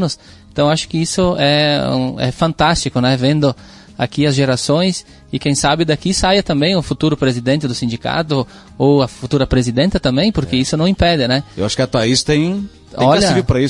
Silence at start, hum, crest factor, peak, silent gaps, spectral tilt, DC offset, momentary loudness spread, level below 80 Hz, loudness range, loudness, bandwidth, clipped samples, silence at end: 0 s; none; 14 dB; -2 dBFS; none; -5 dB/octave; under 0.1%; 7 LU; -34 dBFS; 1 LU; -15 LUFS; 11.5 kHz; under 0.1%; 0 s